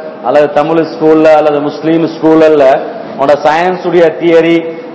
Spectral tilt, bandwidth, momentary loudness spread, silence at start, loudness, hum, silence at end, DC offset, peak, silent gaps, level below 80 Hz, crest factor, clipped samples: -7 dB/octave; 8 kHz; 7 LU; 0 s; -8 LUFS; none; 0 s; under 0.1%; 0 dBFS; none; -50 dBFS; 8 dB; 5%